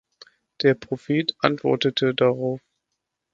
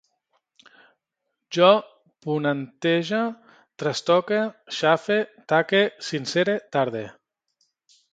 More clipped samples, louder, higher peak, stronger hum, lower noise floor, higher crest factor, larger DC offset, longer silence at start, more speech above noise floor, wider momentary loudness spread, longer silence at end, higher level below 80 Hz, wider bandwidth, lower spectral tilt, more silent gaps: neither; about the same, -22 LUFS vs -23 LUFS; about the same, 0 dBFS vs -2 dBFS; neither; about the same, -80 dBFS vs -81 dBFS; about the same, 24 dB vs 22 dB; neither; second, 0.6 s vs 1.5 s; about the same, 58 dB vs 58 dB; second, 7 LU vs 11 LU; second, 0.75 s vs 1.05 s; first, -64 dBFS vs -72 dBFS; second, 7.4 kHz vs 9.2 kHz; first, -6.5 dB/octave vs -5 dB/octave; neither